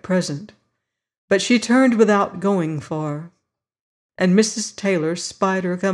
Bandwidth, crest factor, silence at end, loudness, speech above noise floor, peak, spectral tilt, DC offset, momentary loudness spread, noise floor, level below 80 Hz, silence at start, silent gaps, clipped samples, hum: 11.5 kHz; 16 dB; 0 s; -19 LUFS; 59 dB; -4 dBFS; -5 dB/octave; under 0.1%; 11 LU; -78 dBFS; -64 dBFS; 0.05 s; 1.18-1.28 s, 3.80-4.09 s; under 0.1%; none